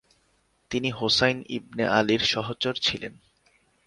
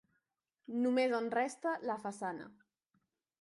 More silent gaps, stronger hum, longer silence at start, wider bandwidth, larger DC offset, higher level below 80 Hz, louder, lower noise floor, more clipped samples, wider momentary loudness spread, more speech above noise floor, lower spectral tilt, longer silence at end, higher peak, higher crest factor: neither; neither; about the same, 0.7 s vs 0.7 s; about the same, 11.5 kHz vs 11.5 kHz; neither; first, -56 dBFS vs -86 dBFS; first, -25 LUFS vs -36 LUFS; second, -68 dBFS vs -85 dBFS; neither; about the same, 12 LU vs 11 LU; second, 42 dB vs 49 dB; about the same, -4 dB/octave vs -4.5 dB/octave; second, 0.75 s vs 0.9 s; first, -4 dBFS vs -20 dBFS; about the same, 22 dB vs 18 dB